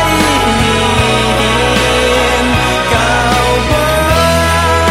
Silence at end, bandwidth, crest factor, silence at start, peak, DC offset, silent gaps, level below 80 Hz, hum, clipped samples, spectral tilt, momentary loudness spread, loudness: 0 s; 16.5 kHz; 10 dB; 0 s; 0 dBFS; under 0.1%; none; -22 dBFS; none; under 0.1%; -4 dB/octave; 1 LU; -10 LUFS